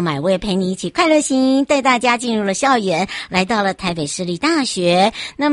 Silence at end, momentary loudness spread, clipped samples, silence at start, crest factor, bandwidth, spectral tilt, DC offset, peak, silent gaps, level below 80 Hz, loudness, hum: 0 s; 6 LU; under 0.1%; 0 s; 14 dB; 11.5 kHz; -4 dB/octave; under 0.1%; -2 dBFS; none; -48 dBFS; -17 LUFS; none